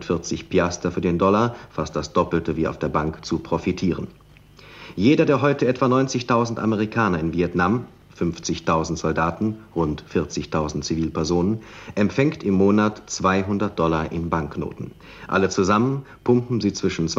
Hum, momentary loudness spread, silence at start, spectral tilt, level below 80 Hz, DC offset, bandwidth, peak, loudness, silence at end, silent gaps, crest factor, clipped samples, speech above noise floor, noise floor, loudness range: none; 9 LU; 0 s; -6 dB/octave; -44 dBFS; under 0.1%; 8 kHz; -4 dBFS; -22 LUFS; 0 s; none; 18 dB; under 0.1%; 26 dB; -47 dBFS; 4 LU